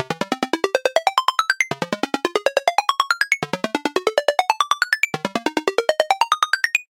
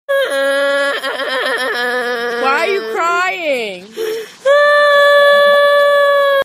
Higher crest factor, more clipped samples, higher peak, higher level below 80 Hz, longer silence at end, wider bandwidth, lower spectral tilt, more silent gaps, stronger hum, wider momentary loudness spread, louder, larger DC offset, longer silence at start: first, 20 dB vs 12 dB; neither; about the same, 0 dBFS vs 0 dBFS; about the same, -68 dBFS vs -72 dBFS; about the same, 0.05 s vs 0 s; about the same, 17 kHz vs 15.5 kHz; about the same, -2.5 dB/octave vs -1.5 dB/octave; neither; neither; second, 5 LU vs 10 LU; second, -20 LUFS vs -12 LUFS; neither; about the same, 0 s vs 0.1 s